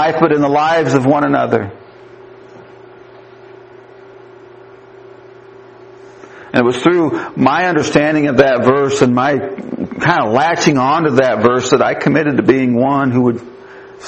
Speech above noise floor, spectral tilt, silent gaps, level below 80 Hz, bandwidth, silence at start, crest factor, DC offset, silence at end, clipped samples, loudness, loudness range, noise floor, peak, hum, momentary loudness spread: 26 dB; -6 dB/octave; none; -52 dBFS; 8.6 kHz; 0 s; 14 dB; under 0.1%; 0 s; under 0.1%; -13 LUFS; 8 LU; -39 dBFS; 0 dBFS; none; 6 LU